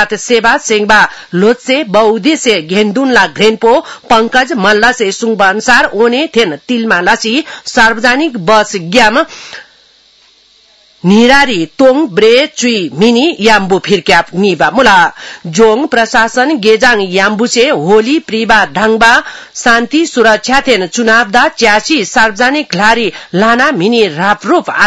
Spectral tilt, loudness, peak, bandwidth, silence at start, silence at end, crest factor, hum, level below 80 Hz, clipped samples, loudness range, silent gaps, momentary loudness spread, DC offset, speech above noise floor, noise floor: -3.5 dB/octave; -8 LUFS; 0 dBFS; 12 kHz; 0 s; 0 s; 8 dB; none; -42 dBFS; 2%; 2 LU; none; 5 LU; 0.7%; 37 dB; -46 dBFS